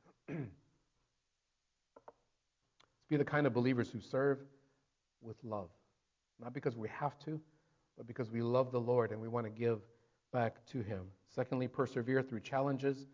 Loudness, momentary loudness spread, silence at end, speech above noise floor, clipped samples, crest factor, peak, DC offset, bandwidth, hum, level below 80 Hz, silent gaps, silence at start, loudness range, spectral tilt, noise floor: -38 LUFS; 14 LU; 0.05 s; 48 dB; under 0.1%; 20 dB; -20 dBFS; under 0.1%; 7.6 kHz; none; -72 dBFS; none; 0.3 s; 7 LU; -8 dB/octave; -85 dBFS